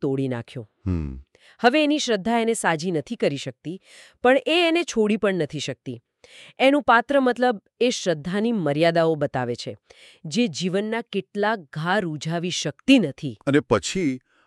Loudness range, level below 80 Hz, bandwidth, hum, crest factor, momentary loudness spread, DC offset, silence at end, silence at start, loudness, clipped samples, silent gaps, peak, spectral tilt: 3 LU; -50 dBFS; 12.5 kHz; none; 20 dB; 14 LU; under 0.1%; 0.3 s; 0 s; -22 LUFS; under 0.1%; none; -4 dBFS; -5 dB/octave